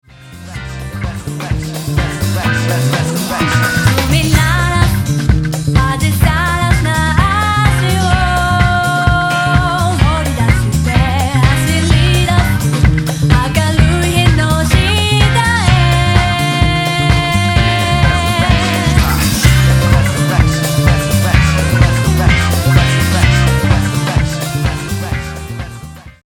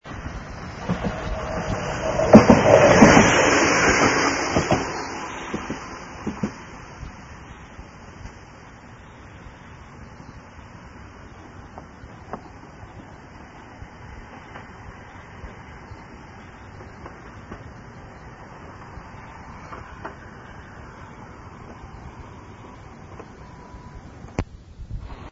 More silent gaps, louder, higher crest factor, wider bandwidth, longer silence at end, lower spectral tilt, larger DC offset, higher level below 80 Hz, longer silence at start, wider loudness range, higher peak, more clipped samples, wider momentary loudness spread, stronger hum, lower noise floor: neither; first, -12 LUFS vs -18 LUFS; second, 12 dB vs 24 dB; first, 17.5 kHz vs 7.8 kHz; first, 0.15 s vs 0 s; about the same, -5 dB/octave vs -5 dB/octave; neither; first, -20 dBFS vs -42 dBFS; first, 0.2 s vs 0.05 s; second, 2 LU vs 27 LU; about the same, 0 dBFS vs 0 dBFS; neither; second, 7 LU vs 27 LU; neither; second, -32 dBFS vs -44 dBFS